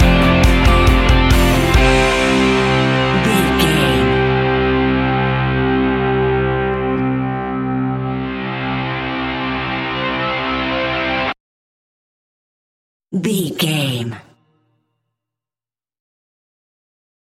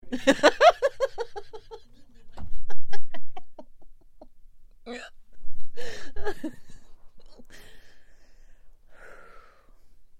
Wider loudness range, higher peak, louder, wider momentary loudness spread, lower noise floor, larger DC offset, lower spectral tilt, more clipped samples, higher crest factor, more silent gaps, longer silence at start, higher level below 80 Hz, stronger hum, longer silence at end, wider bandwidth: second, 10 LU vs 23 LU; about the same, 0 dBFS vs -2 dBFS; first, -16 LUFS vs -25 LUFS; second, 9 LU vs 29 LU; first, under -90 dBFS vs -49 dBFS; neither; first, -5.5 dB/octave vs -4 dB/octave; neither; about the same, 16 dB vs 18 dB; first, 11.40-13.00 s vs none; about the same, 0 s vs 0.05 s; first, -24 dBFS vs -42 dBFS; neither; first, 3.15 s vs 1.25 s; first, 16.5 kHz vs 9.6 kHz